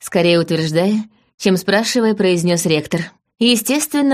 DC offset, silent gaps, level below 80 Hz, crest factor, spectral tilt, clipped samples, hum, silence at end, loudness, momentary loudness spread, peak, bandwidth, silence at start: under 0.1%; 1.34-1.38 s; -58 dBFS; 16 dB; -4.5 dB/octave; under 0.1%; none; 0 s; -16 LUFS; 8 LU; 0 dBFS; 15.5 kHz; 0 s